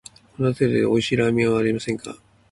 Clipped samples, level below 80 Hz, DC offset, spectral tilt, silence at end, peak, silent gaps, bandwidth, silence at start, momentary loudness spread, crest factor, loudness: under 0.1%; -52 dBFS; under 0.1%; -6.5 dB/octave; 0.35 s; -6 dBFS; none; 11.5 kHz; 0.4 s; 10 LU; 16 dB; -21 LUFS